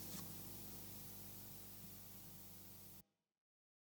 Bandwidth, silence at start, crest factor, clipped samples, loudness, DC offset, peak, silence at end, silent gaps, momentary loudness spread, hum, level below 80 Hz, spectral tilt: over 20 kHz; 0 s; 18 dB; under 0.1%; -52 LUFS; under 0.1%; -38 dBFS; 0.8 s; none; 6 LU; 50 Hz at -65 dBFS; -72 dBFS; -3.5 dB/octave